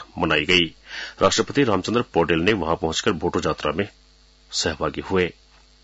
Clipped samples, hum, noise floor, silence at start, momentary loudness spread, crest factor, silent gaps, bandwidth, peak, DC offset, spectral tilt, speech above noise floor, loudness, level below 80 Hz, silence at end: under 0.1%; none; -48 dBFS; 0 s; 9 LU; 18 dB; none; 8 kHz; -4 dBFS; under 0.1%; -4 dB/octave; 26 dB; -22 LUFS; -48 dBFS; 0.5 s